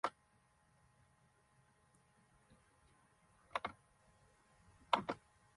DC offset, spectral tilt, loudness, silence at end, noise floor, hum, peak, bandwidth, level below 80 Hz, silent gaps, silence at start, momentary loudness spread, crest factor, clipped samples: under 0.1%; -4 dB/octave; -43 LUFS; 0.4 s; -74 dBFS; none; -16 dBFS; 11.5 kHz; -78 dBFS; none; 0.05 s; 11 LU; 34 dB; under 0.1%